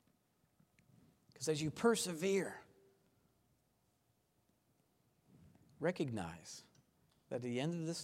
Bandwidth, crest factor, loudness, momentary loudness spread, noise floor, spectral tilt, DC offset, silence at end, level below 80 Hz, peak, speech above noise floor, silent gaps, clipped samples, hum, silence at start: 16 kHz; 24 dB; -39 LUFS; 17 LU; -79 dBFS; -4.5 dB/octave; under 0.1%; 0 s; -78 dBFS; -20 dBFS; 40 dB; none; under 0.1%; none; 1.4 s